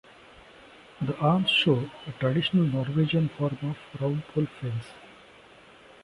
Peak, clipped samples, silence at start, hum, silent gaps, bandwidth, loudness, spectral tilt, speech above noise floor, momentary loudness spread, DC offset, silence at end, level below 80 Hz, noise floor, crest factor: -10 dBFS; under 0.1%; 1 s; none; none; 11 kHz; -27 LUFS; -7.5 dB/octave; 26 dB; 13 LU; under 0.1%; 0.95 s; -60 dBFS; -52 dBFS; 18 dB